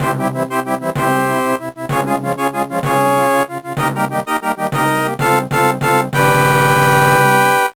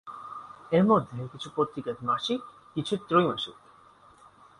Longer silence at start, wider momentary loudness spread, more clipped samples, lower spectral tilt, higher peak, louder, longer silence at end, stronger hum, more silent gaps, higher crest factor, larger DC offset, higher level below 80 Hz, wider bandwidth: about the same, 0 s vs 0.05 s; second, 8 LU vs 17 LU; neither; second, -5 dB/octave vs -6.5 dB/octave; first, -2 dBFS vs -10 dBFS; first, -15 LUFS vs -28 LUFS; second, 0.05 s vs 1.1 s; neither; neither; second, 12 dB vs 20 dB; neither; first, -44 dBFS vs -66 dBFS; first, over 20 kHz vs 11 kHz